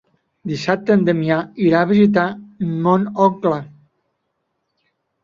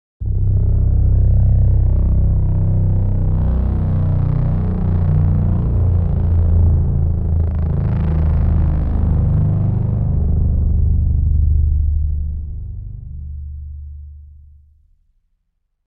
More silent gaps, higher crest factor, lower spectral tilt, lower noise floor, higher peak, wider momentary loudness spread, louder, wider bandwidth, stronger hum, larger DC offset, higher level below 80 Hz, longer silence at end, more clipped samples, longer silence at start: neither; first, 16 dB vs 10 dB; second, -8 dB/octave vs -13 dB/octave; first, -72 dBFS vs -68 dBFS; about the same, -2 dBFS vs -4 dBFS; second, 12 LU vs 15 LU; about the same, -17 LUFS vs -17 LUFS; first, 7.4 kHz vs 2.4 kHz; neither; neither; second, -58 dBFS vs -18 dBFS; about the same, 1.6 s vs 1.6 s; neither; first, 0.45 s vs 0.2 s